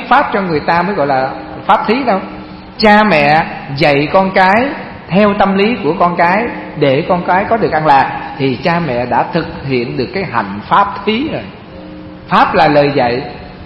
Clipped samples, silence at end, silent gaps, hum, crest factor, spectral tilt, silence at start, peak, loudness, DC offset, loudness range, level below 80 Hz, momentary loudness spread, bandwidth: 0.2%; 0 s; none; none; 12 dB; -7.5 dB/octave; 0 s; 0 dBFS; -12 LUFS; under 0.1%; 4 LU; -40 dBFS; 11 LU; 8.8 kHz